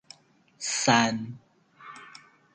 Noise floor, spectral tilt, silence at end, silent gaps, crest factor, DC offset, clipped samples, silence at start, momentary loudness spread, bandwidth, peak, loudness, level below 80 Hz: -61 dBFS; -3 dB/octave; 0.45 s; none; 22 dB; under 0.1%; under 0.1%; 0.6 s; 26 LU; 9.6 kHz; -8 dBFS; -25 LUFS; -66 dBFS